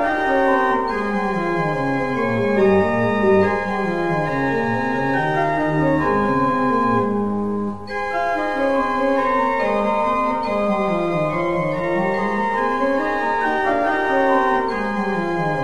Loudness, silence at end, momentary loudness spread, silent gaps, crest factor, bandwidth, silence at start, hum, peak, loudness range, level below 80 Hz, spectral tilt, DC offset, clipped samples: -19 LUFS; 0 s; 5 LU; none; 14 dB; 12 kHz; 0 s; none; -4 dBFS; 1 LU; -46 dBFS; -7 dB/octave; 1%; under 0.1%